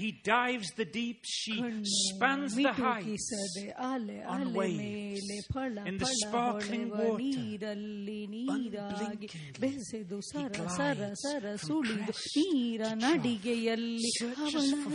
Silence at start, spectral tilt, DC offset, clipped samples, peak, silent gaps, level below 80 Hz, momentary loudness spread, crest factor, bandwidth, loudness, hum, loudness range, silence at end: 0 s; -3.5 dB/octave; under 0.1%; under 0.1%; -10 dBFS; none; -64 dBFS; 9 LU; 22 dB; 10.5 kHz; -33 LUFS; none; 5 LU; 0 s